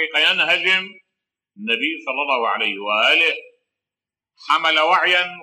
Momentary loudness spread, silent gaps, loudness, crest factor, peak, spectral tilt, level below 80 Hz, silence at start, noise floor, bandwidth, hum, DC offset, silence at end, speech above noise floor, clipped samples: 8 LU; none; -17 LUFS; 16 dB; -4 dBFS; -2 dB/octave; -88 dBFS; 0 s; -89 dBFS; 16 kHz; none; under 0.1%; 0 s; 70 dB; under 0.1%